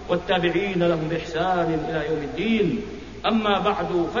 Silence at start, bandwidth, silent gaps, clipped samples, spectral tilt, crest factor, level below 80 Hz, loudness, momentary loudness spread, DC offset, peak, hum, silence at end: 0 s; 7.4 kHz; none; under 0.1%; -6.5 dB/octave; 16 dB; -46 dBFS; -23 LUFS; 5 LU; 0.4%; -8 dBFS; none; 0 s